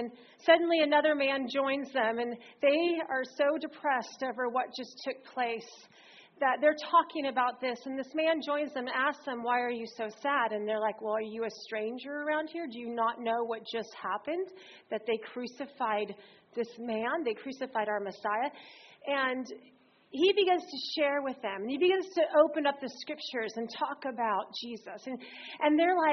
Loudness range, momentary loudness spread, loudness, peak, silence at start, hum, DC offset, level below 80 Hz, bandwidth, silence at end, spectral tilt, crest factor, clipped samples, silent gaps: 6 LU; 14 LU; -31 LUFS; -8 dBFS; 0 s; none; under 0.1%; -82 dBFS; 6.4 kHz; 0 s; -1 dB/octave; 22 dB; under 0.1%; none